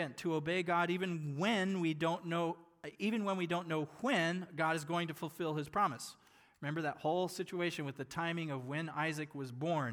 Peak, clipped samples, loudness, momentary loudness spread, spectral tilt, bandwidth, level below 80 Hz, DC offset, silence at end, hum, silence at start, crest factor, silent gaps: -20 dBFS; under 0.1%; -37 LUFS; 8 LU; -5.5 dB/octave; 19.5 kHz; -78 dBFS; under 0.1%; 0 s; none; 0 s; 16 dB; none